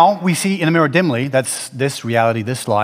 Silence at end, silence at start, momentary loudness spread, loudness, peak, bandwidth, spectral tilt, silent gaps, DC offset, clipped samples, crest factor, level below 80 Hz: 0 s; 0 s; 7 LU; -17 LUFS; 0 dBFS; 16 kHz; -5 dB/octave; none; under 0.1%; under 0.1%; 16 dB; -64 dBFS